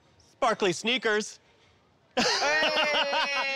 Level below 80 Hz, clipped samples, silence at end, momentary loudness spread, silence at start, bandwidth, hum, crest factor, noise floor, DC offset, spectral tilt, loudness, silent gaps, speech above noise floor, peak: -66 dBFS; under 0.1%; 0 s; 6 LU; 0.4 s; 16 kHz; none; 12 dB; -63 dBFS; under 0.1%; -2 dB/octave; -25 LUFS; none; 37 dB; -16 dBFS